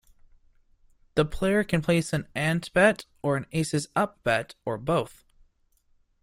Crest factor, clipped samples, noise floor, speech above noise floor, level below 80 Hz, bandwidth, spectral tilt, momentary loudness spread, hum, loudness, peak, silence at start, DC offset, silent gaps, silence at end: 20 dB; under 0.1%; -66 dBFS; 40 dB; -50 dBFS; 16 kHz; -5.5 dB/octave; 9 LU; none; -26 LUFS; -8 dBFS; 1.15 s; under 0.1%; none; 1.15 s